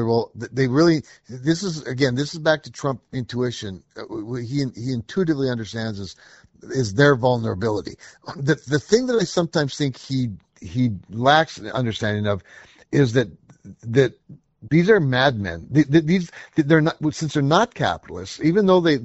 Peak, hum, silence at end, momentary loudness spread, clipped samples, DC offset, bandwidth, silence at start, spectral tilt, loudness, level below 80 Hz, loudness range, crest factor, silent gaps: -2 dBFS; none; 0 s; 13 LU; under 0.1%; under 0.1%; 8 kHz; 0 s; -5.5 dB/octave; -21 LUFS; -52 dBFS; 6 LU; 20 dB; none